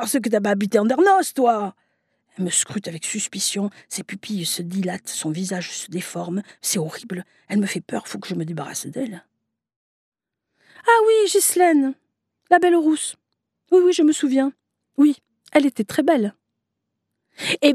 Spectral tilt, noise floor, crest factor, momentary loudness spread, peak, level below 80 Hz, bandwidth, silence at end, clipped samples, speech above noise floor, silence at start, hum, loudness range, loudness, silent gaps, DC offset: -4 dB/octave; -79 dBFS; 20 dB; 13 LU; -2 dBFS; -76 dBFS; 14.5 kHz; 0 s; under 0.1%; 59 dB; 0 s; none; 8 LU; -20 LUFS; 9.76-10.12 s; under 0.1%